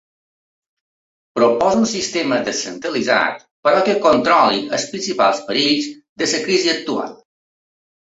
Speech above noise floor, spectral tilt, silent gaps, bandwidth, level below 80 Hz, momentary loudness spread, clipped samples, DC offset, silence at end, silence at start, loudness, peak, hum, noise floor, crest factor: over 73 dB; -3 dB/octave; 3.51-3.63 s, 6.09-6.16 s; 8.4 kHz; -60 dBFS; 9 LU; under 0.1%; under 0.1%; 1.05 s; 1.35 s; -17 LUFS; -2 dBFS; none; under -90 dBFS; 18 dB